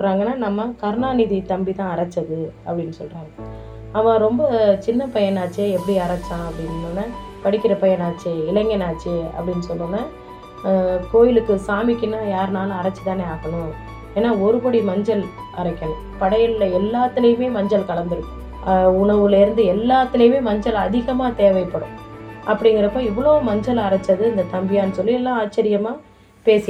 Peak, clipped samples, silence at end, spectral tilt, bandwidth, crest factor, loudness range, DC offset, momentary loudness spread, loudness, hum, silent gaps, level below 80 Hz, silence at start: -2 dBFS; under 0.1%; 0 s; -7.5 dB/octave; 11.5 kHz; 18 dB; 5 LU; under 0.1%; 12 LU; -19 LUFS; none; none; -40 dBFS; 0 s